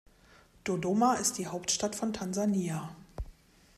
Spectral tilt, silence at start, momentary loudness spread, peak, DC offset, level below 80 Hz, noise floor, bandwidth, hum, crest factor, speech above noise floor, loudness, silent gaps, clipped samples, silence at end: -4 dB/octave; 0.65 s; 19 LU; -14 dBFS; under 0.1%; -52 dBFS; -60 dBFS; 15.5 kHz; none; 18 dB; 29 dB; -31 LUFS; none; under 0.1%; 0.45 s